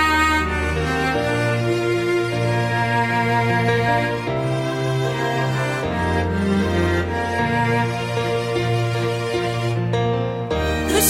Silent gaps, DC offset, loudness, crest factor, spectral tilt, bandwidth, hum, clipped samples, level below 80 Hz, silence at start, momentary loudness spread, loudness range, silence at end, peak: none; under 0.1%; -20 LUFS; 18 dB; -5 dB/octave; 16 kHz; none; under 0.1%; -36 dBFS; 0 s; 4 LU; 2 LU; 0 s; -2 dBFS